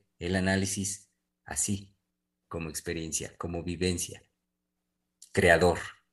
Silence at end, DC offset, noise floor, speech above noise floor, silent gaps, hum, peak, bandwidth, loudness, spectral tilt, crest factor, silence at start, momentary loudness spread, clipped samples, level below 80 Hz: 0.2 s; under 0.1%; -83 dBFS; 54 dB; none; none; -6 dBFS; 13 kHz; -29 LUFS; -4 dB/octave; 26 dB; 0.2 s; 14 LU; under 0.1%; -52 dBFS